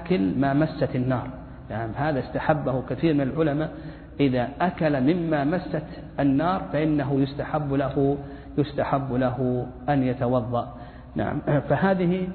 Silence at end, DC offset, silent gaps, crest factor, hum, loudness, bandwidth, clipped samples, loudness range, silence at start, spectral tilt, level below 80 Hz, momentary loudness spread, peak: 0 s; under 0.1%; none; 18 dB; none; -25 LUFS; 4.5 kHz; under 0.1%; 2 LU; 0 s; -11.5 dB/octave; -46 dBFS; 9 LU; -6 dBFS